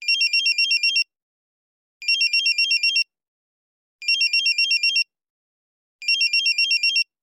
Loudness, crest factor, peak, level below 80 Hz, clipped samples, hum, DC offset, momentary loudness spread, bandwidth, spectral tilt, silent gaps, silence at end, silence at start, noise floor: -18 LUFS; 12 dB; -10 dBFS; under -90 dBFS; under 0.1%; none; under 0.1%; 11 LU; 17 kHz; 11.5 dB/octave; 1.22-2.00 s, 3.28-3.99 s, 5.30-5.99 s; 0.2 s; 0 s; under -90 dBFS